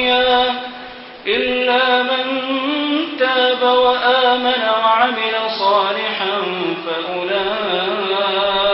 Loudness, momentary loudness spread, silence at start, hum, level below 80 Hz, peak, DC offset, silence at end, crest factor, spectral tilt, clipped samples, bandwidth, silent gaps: -16 LUFS; 8 LU; 0 s; none; -54 dBFS; -2 dBFS; under 0.1%; 0 s; 16 dB; -8 dB/octave; under 0.1%; 5.8 kHz; none